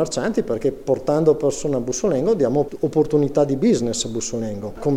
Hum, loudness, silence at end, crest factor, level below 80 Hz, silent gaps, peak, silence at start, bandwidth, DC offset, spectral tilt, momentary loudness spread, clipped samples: none; -20 LUFS; 0 s; 16 dB; -44 dBFS; none; -4 dBFS; 0 s; 13 kHz; under 0.1%; -5.5 dB/octave; 7 LU; under 0.1%